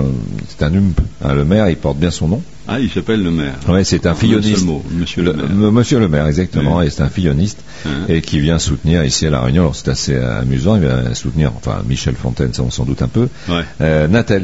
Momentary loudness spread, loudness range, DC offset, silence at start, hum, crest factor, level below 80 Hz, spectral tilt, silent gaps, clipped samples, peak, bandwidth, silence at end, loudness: 6 LU; 2 LU; 2%; 0 s; none; 14 dB; -28 dBFS; -6 dB/octave; none; under 0.1%; 0 dBFS; 8 kHz; 0 s; -15 LUFS